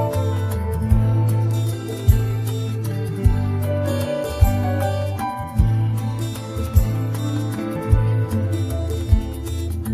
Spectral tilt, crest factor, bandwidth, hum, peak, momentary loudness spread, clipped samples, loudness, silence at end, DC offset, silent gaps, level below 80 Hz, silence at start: -7.5 dB/octave; 18 dB; 15 kHz; none; -2 dBFS; 7 LU; under 0.1%; -21 LUFS; 0 s; under 0.1%; none; -26 dBFS; 0 s